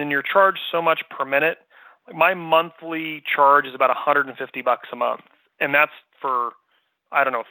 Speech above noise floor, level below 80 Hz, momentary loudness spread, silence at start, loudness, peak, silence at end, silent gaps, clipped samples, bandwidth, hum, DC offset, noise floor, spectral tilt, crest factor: 47 dB; -80 dBFS; 11 LU; 0 s; -20 LUFS; -2 dBFS; 0.1 s; none; under 0.1%; 19.5 kHz; none; under 0.1%; -68 dBFS; -7.5 dB/octave; 20 dB